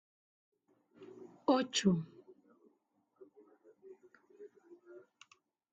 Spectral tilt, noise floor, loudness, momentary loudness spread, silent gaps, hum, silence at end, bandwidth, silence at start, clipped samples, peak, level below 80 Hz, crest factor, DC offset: -5 dB/octave; -78 dBFS; -33 LUFS; 27 LU; none; none; 0.75 s; 8.8 kHz; 1 s; under 0.1%; -18 dBFS; -78 dBFS; 24 dB; under 0.1%